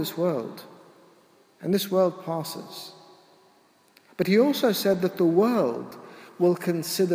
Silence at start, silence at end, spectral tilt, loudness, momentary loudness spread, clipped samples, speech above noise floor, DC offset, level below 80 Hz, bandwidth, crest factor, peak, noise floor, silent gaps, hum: 0 s; 0 s; -5.5 dB/octave; -24 LUFS; 20 LU; under 0.1%; 36 dB; under 0.1%; -74 dBFS; 16 kHz; 16 dB; -10 dBFS; -60 dBFS; none; none